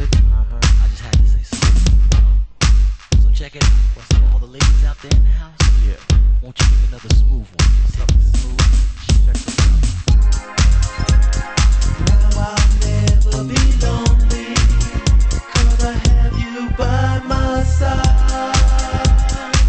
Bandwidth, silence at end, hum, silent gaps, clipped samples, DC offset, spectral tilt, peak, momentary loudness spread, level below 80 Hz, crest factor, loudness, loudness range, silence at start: 8.6 kHz; 0 s; none; none; under 0.1%; under 0.1%; -5 dB/octave; -2 dBFS; 3 LU; -14 dBFS; 12 dB; -16 LUFS; 1 LU; 0 s